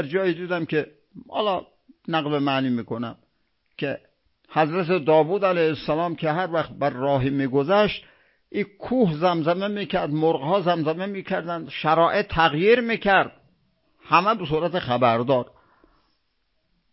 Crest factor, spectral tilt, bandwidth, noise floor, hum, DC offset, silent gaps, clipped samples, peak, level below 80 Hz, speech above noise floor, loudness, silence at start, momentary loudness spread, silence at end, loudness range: 22 dB; -10.5 dB/octave; 5.8 kHz; -72 dBFS; none; under 0.1%; none; under 0.1%; -2 dBFS; -54 dBFS; 50 dB; -23 LUFS; 0 s; 11 LU; 1.45 s; 5 LU